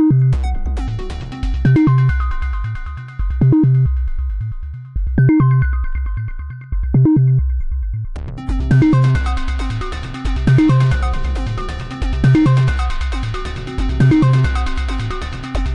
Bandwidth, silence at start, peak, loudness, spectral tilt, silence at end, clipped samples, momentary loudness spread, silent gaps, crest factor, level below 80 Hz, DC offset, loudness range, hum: 8.4 kHz; 0 s; -4 dBFS; -17 LUFS; -8 dB/octave; 0 s; under 0.1%; 14 LU; none; 12 dB; -22 dBFS; 0.4%; 2 LU; none